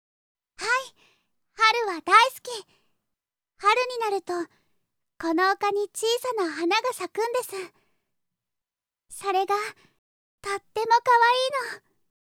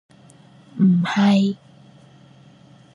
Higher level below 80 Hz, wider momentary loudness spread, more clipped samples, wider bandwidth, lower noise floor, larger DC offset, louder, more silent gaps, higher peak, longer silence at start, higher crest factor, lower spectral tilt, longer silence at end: about the same, -72 dBFS vs -68 dBFS; about the same, 18 LU vs 18 LU; neither; first, 17.5 kHz vs 10.5 kHz; first, -90 dBFS vs -49 dBFS; neither; second, -24 LUFS vs -18 LUFS; first, 9.98-10.38 s vs none; about the same, -4 dBFS vs -6 dBFS; second, 0.6 s vs 0.75 s; first, 24 dB vs 16 dB; second, -1 dB/octave vs -7 dB/octave; second, 0.55 s vs 1.4 s